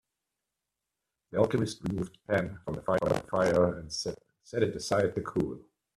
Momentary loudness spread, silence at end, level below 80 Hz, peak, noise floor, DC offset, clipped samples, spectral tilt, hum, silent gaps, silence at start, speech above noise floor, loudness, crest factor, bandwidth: 9 LU; 0.4 s; -58 dBFS; -10 dBFS; -87 dBFS; under 0.1%; under 0.1%; -5.5 dB/octave; none; none; 1.3 s; 57 dB; -31 LUFS; 22 dB; 13.5 kHz